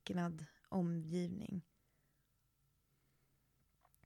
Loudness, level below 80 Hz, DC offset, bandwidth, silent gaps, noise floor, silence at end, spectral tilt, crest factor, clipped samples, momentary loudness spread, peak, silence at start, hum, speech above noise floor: -43 LUFS; -76 dBFS; under 0.1%; 12 kHz; none; -80 dBFS; 2.45 s; -7.5 dB/octave; 18 dB; under 0.1%; 9 LU; -28 dBFS; 0.05 s; none; 39 dB